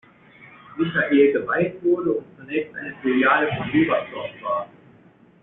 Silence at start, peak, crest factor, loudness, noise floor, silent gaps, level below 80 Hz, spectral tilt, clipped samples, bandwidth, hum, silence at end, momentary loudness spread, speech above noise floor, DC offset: 0.4 s; -6 dBFS; 18 dB; -22 LUFS; -52 dBFS; none; -60 dBFS; -4.5 dB/octave; under 0.1%; 4 kHz; none; 0.75 s; 13 LU; 31 dB; under 0.1%